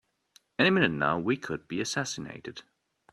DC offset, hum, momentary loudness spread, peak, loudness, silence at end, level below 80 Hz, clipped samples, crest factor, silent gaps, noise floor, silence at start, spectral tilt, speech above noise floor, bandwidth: under 0.1%; none; 18 LU; -8 dBFS; -28 LUFS; 0.5 s; -64 dBFS; under 0.1%; 22 dB; none; -65 dBFS; 0.6 s; -4.5 dB/octave; 35 dB; 12.5 kHz